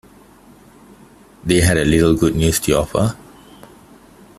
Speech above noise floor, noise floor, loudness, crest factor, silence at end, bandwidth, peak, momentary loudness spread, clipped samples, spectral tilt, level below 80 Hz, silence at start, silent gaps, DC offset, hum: 31 dB; -46 dBFS; -16 LUFS; 18 dB; 1.2 s; 15.5 kHz; -2 dBFS; 8 LU; under 0.1%; -5 dB/octave; -36 dBFS; 1.45 s; none; under 0.1%; none